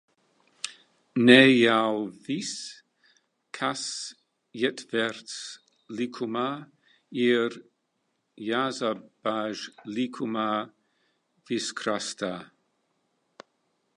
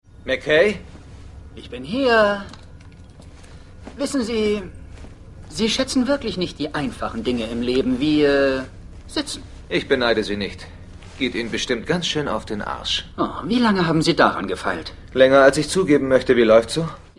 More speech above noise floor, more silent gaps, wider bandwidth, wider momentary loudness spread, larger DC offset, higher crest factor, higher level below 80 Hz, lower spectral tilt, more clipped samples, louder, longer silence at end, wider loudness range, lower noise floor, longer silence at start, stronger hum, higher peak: first, 50 dB vs 23 dB; neither; about the same, 11 kHz vs 11.5 kHz; first, 19 LU vs 16 LU; neither; first, 26 dB vs 20 dB; second, -78 dBFS vs -42 dBFS; about the same, -4 dB/octave vs -4.5 dB/octave; neither; second, -26 LUFS vs -20 LUFS; first, 1.5 s vs 0.2 s; first, 10 LU vs 7 LU; first, -76 dBFS vs -42 dBFS; first, 0.65 s vs 0.2 s; neither; about the same, -2 dBFS vs 0 dBFS